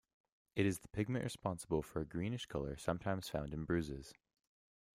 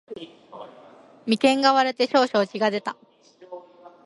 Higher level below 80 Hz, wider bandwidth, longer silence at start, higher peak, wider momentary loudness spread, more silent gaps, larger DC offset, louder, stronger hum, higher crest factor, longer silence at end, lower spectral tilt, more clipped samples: first, -60 dBFS vs -74 dBFS; first, 16 kHz vs 11.5 kHz; first, 0.55 s vs 0.1 s; second, -20 dBFS vs -4 dBFS; second, 6 LU vs 24 LU; neither; neither; second, -41 LUFS vs -21 LUFS; neither; about the same, 20 dB vs 20 dB; first, 0.85 s vs 0.15 s; first, -6 dB/octave vs -4 dB/octave; neither